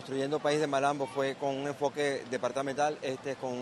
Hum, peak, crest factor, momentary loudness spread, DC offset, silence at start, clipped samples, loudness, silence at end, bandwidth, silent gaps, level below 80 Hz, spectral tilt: none; -16 dBFS; 16 dB; 7 LU; under 0.1%; 0 s; under 0.1%; -32 LUFS; 0 s; 12.5 kHz; none; -74 dBFS; -4.5 dB/octave